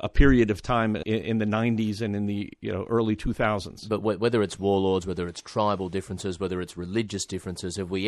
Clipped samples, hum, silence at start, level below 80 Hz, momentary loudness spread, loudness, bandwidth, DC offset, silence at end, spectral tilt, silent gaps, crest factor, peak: under 0.1%; none; 0 s; -36 dBFS; 9 LU; -27 LUFS; 12.5 kHz; under 0.1%; 0 s; -6 dB/octave; none; 20 dB; -6 dBFS